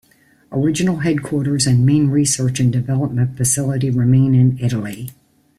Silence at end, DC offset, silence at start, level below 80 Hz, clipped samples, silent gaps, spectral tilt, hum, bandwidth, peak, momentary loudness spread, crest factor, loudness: 0.45 s; under 0.1%; 0.5 s; -50 dBFS; under 0.1%; none; -5.5 dB/octave; none; 14.5 kHz; -4 dBFS; 8 LU; 12 dB; -17 LUFS